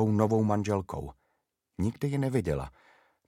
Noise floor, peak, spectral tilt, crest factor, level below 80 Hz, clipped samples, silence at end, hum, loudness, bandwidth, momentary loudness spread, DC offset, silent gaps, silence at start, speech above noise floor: -79 dBFS; -10 dBFS; -8 dB/octave; 20 dB; -50 dBFS; under 0.1%; 0.6 s; none; -30 LUFS; 14.5 kHz; 18 LU; under 0.1%; none; 0 s; 50 dB